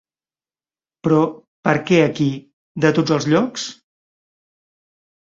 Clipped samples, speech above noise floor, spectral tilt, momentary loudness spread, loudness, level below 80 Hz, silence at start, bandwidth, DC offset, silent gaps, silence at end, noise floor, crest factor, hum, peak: under 0.1%; over 73 dB; -6 dB/octave; 13 LU; -18 LUFS; -60 dBFS; 1.05 s; 7.8 kHz; under 0.1%; 1.47-1.63 s, 2.53-2.75 s; 1.6 s; under -90 dBFS; 20 dB; none; -2 dBFS